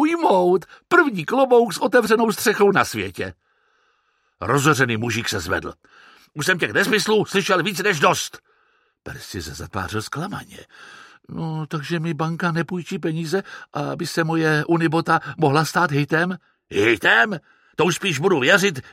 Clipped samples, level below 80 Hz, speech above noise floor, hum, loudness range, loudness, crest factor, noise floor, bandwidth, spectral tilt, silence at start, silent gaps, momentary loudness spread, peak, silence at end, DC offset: under 0.1%; -56 dBFS; 46 dB; none; 8 LU; -20 LUFS; 20 dB; -66 dBFS; 16 kHz; -4.5 dB/octave; 0 s; none; 15 LU; -2 dBFS; 0.05 s; under 0.1%